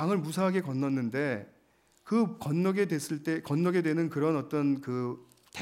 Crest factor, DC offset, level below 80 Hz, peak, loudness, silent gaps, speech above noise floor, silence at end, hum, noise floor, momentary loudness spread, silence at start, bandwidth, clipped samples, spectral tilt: 14 dB; under 0.1%; -76 dBFS; -16 dBFS; -30 LUFS; none; 37 dB; 0 s; none; -66 dBFS; 6 LU; 0 s; 16 kHz; under 0.1%; -7 dB/octave